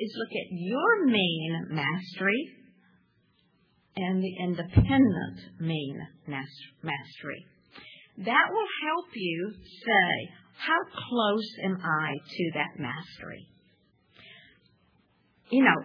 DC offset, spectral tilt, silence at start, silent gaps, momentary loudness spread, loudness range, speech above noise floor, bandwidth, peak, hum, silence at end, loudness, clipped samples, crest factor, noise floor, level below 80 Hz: under 0.1%; -8 dB/octave; 0 s; none; 18 LU; 6 LU; 40 dB; 5.4 kHz; -8 dBFS; none; 0 s; -28 LUFS; under 0.1%; 22 dB; -68 dBFS; -48 dBFS